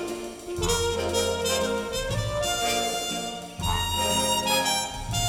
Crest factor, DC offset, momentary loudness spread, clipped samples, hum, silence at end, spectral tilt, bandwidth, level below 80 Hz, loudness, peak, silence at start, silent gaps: 16 dB; under 0.1%; 9 LU; under 0.1%; none; 0 s; -3 dB/octave; over 20 kHz; -40 dBFS; -26 LUFS; -12 dBFS; 0 s; none